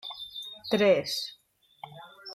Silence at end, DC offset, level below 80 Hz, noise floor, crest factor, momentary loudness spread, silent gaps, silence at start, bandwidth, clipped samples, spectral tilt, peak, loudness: 0 s; under 0.1%; -70 dBFS; -50 dBFS; 20 dB; 23 LU; none; 0.05 s; 15.5 kHz; under 0.1%; -4 dB/octave; -12 dBFS; -28 LUFS